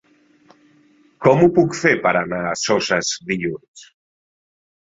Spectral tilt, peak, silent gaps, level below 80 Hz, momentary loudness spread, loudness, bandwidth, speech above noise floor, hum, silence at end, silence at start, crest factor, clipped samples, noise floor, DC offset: -4.5 dB/octave; -2 dBFS; 3.68-3.74 s; -56 dBFS; 10 LU; -18 LUFS; 7.8 kHz; 37 dB; none; 1.1 s; 1.2 s; 20 dB; under 0.1%; -55 dBFS; under 0.1%